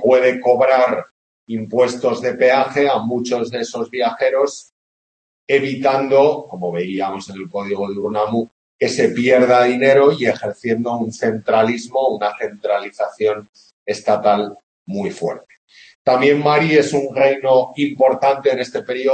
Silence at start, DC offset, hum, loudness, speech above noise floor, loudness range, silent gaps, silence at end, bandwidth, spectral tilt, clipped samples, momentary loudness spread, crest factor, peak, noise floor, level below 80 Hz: 0 s; under 0.1%; none; -17 LUFS; over 74 dB; 5 LU; 1.11-1.47 s, 4.72-5.47 s, 8.51-8.79 s, 13.49-13.53 s, 13.73-13.86 s, 14.63-14.86 s, 15.58-15.67 s, 15.95-16.05 s; 0 s; 8.8 kHz; -5.5 dB/octave; under 0.1%; 12 LU; 16 dB; 0 dBFS; under -90 dBFS; -64 dBFS